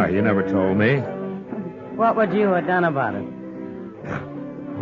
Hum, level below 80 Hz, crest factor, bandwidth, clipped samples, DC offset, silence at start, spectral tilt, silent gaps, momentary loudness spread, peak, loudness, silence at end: none; -56 dBFS; 14 dB; 6.8 kHz; under 0.1%; under 0.1%; 0 s; -9 dB/octave; none; 15 LU; -8 dBFS; -22 LUFS; 0 s